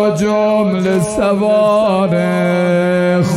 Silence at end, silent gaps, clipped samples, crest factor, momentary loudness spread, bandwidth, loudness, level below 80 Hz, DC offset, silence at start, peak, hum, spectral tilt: 0 s; none; under 0.1%; 10 dB; 3 LU; 13 kHz; -13 LUFS; -46 dBFS; under 0.1%; 0 s; -4 dBFS; none; -6.5 dB/octave